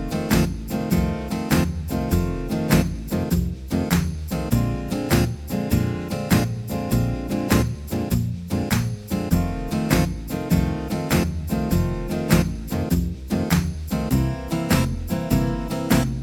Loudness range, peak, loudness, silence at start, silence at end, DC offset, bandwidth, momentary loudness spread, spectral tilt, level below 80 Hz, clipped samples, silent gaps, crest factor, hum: 1 LU; -2 dBFS; -23 LUFS; 0 s; 0 s; under 0.1%; 19.5 kHz; 6 LU; -6 dB/octave; -32 dBFS; under 0.1%; none; 20 dB; none